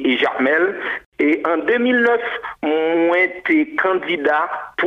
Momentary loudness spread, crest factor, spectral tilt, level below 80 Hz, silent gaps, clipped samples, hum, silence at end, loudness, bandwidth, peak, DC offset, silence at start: 7 LU; 14 dB; -5.5 dB/octave; -62 dBFS; 1.06-1.12 s; under 0.1%; none; 0 s; -18 LUFS; 6.6 kHz; -4 dBFS; under 0.1%; 0 s